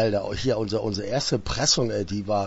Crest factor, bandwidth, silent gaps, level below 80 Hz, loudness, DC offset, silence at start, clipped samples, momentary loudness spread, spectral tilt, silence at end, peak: 16 dB; 8.2 kHz; none; -44 dBFS; -25 LUFS; under 0.1%; 0 s; under 0.1%; 6 LU; -4 dB/octave; 0 s; -8 dBFS